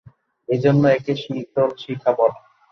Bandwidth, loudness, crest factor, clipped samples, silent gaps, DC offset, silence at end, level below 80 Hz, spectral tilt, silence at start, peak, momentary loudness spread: 6.4 kHz; -20 LUFS; 16 dB; under 0.1%; none; under 0.1%; 0.35 s; -62 dBFS; -8 dB/octave; 0.5 s; -4 dBFS; 10 LU